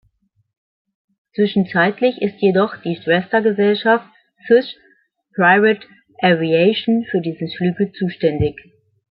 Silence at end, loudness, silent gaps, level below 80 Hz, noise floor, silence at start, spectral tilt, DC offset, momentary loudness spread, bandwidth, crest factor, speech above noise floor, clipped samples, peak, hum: 0.6 s; -17 LUFS; none; -50 dBFS; -63 dBFS; 1.4 s; -10.5 dB/octave; under 0.1%; 8 LU; 5.4 kHz; 16 dB; 46 dB; under 0.1%; -2 dBFS; none